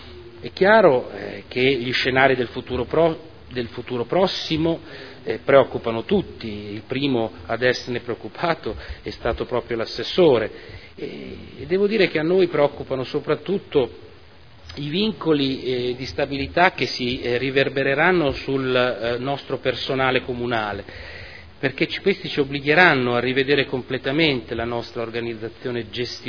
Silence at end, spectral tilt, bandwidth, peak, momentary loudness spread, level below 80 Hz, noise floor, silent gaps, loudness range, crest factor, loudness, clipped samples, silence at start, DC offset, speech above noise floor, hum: 0 s; -6 dB/octave; 5.4 kHz; 0 dBFS; 16 LU; -46 dBFS; -48 dBFS; none; 5 LU; 22 dB; -21 LUFS; under 0.1%; 0 s; 0.4%; 26 dB; none